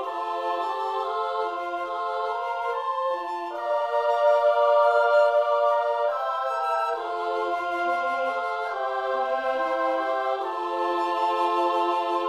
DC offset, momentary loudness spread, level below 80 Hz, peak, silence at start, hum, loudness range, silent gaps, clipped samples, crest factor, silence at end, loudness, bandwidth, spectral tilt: under 0.1%; 8 LU; -74 dBFS; -10 dBFS; 0 s; none; 6 LU; none; under 0.1%; 14 dB; 0 s; -25 LUFS; 12 kHz; -2.5 dB/octave